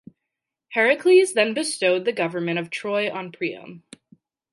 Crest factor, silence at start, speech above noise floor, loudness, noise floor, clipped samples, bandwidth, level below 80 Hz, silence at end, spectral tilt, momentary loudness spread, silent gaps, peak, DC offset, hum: 18 dB; 0.7 s; 62 dB; -21 LUFS; -84 dBFS; under 0.1%; 11.5 kHz; -78 dBFS; 0.75 s; -4 dB/octave; 13 LU; none; -6 dBFS; under 0.1%; none